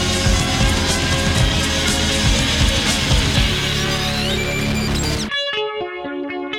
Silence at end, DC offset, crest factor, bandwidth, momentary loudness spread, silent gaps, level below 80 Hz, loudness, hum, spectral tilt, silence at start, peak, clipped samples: 0 s; under 0.1%; 16 dB; 16.5 kHz; 6 LU; none; -24 dBFS; -18 LUFS; none; -3.5 dB/octave; 0 s; -2 dBFS; under 0.1%